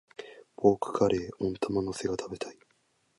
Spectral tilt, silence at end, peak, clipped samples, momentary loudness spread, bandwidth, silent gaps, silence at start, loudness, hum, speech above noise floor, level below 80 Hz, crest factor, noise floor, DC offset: -6 dB/octave; 0.65 s; -8 dBFS; under 0.1%; 18 LU; 11.5 kHz; none; 0.2 s; -30 LUFS; none; 42 dB; -58 dBFS; 22 dB; -71 dBFS; under 0.1%